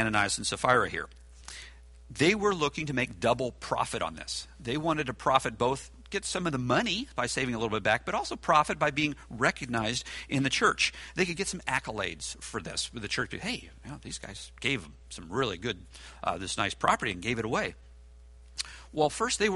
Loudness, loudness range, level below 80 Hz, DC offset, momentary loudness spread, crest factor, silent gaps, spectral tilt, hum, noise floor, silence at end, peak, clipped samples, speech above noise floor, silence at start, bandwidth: -30 LUFS; 6 LU; -52 dBFS; under 0.1%; 14 LU; 22 dB; none; -3.5 dB/octave; none; -52 dBFS; 0 s; -8 dBFS; under 0.1%; 21 dB; 0 s; 11.5 kHz